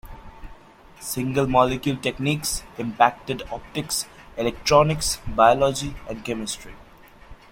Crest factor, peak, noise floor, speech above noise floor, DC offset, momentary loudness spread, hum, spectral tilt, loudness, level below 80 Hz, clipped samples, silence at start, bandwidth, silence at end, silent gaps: 22 dB; -2 dBFS; -47 dBFS; 25 dB; under 0.1%; 14 LU; none; -4 dB/octave; -23 LUFS; -42 dBFS; under 0.1%; 0.05 s; 16.5 kHz; 0.15 s; none